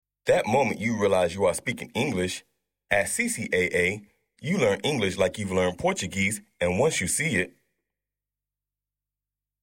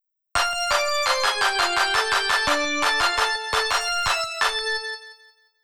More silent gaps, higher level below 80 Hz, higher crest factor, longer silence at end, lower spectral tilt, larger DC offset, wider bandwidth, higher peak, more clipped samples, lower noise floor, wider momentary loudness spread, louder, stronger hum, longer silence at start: neither; second, -56 dBFS vs -48 dBFS; about the same, 20 dB vs 16 dB; first, 2.15 s vs 0.5 s; first, -4 dB/octave vs -0.5 dB/octave; neither; second, 16.5 kHz vs over 20 kHz; about the same, -6 dBFS vs -8 dBFS; neither; first, -89 dBFS vs -55 dBFS; about the same, 7 LU vs 5 LU; second, -25 LUFS vs -21 LUFS; first, 50 Hz at -60 dBFS vs none; about the same, 0.25 s vs 0.35 s